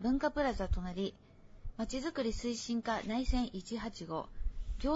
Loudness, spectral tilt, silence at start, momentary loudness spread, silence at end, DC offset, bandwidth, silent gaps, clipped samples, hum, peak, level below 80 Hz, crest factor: -37 LUFS; -5 dB/octave; 0 s; 10 LU; 0 s; under 0.1%; 7.6 kHz; none; under 0.1%; none; -20 dBFS; -42 dBFS; 16 dB